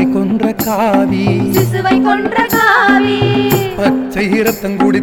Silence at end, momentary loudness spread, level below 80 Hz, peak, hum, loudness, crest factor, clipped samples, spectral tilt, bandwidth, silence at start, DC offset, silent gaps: 0 s; 5 LU; -40 dBFS; 0 dBFS; none; -12 LUFS; 12 dB; under 0.1%; -5.5 dB/octave; 17.5 kHz; 0 s; under 0.1%; none